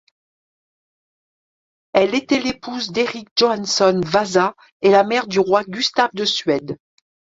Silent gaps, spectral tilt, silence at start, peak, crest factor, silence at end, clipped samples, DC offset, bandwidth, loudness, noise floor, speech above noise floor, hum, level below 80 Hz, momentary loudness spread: 3.31-3.36 s, 4.72-4.80 s; -4 dB/octave; 1.95 s; 0 dBFS; 18 dB; 0.65 s; under 0.1%; under 0.1%; 7.8 kHz; -18 LUFS; under -90 dBFS; over 72 dB; none; -58 dBFS; 8 LU